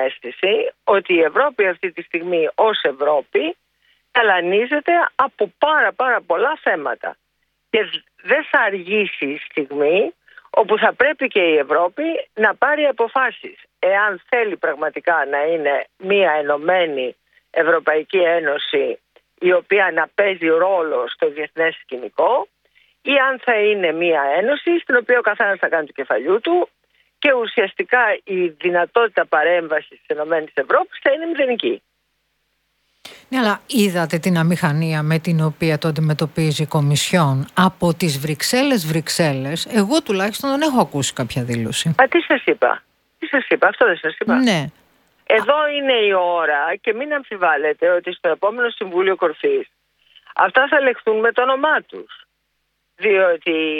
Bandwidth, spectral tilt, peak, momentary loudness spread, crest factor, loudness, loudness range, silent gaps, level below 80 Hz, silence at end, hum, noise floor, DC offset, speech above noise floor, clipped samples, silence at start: 18 kHz; -5 dB/octave; 0 dBFS; 7 LU; 18 dB; -18 LUFS; 2 LU; none; -62 dBFS; 0 s; none; -70 dBFS; under 0.1%; 52 dB; under 0.1%; 0 s